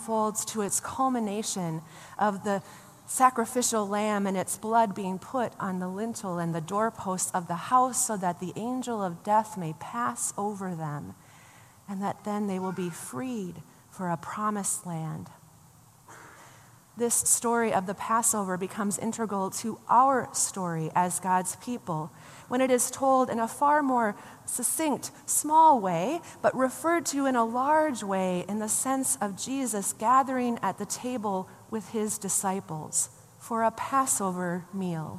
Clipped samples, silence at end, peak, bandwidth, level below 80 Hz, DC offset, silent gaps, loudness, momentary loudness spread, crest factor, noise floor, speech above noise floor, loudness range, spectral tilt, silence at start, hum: under 0.1%; 0 s; -8 dBFS; 15 kHz; -70 dBFS; under 0.1%; none; -28 LUFS; 11 LU; 20 dB; -56 dBFS; 28 dB; 8 LU; -4 dB/octave; 0 s; none